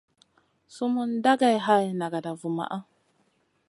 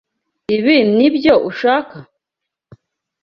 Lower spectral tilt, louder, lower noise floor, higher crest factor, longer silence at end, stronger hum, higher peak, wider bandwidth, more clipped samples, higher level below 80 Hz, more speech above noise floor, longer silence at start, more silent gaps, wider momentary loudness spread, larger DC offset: second, -5.5 dB/octave vs -7.5 dB/octave; second, -26 LUFS vs -14 LUFS; second, -69 dBFS vs -82 dBFS; first, 20 dB vs 14 dB; second, 0.85 s vs 1.2 s; neither; second, -8 dBFS vs -2 dBFS; first, 11.5 kHz vs 6.4 kHz; neither; second, -80 dBFS vs -54 dBFS; second, 44 dB vs 68 dB; first, 0.7 s vs 0.5 s; neither; about the same, 11 LU vs 13 LU; neither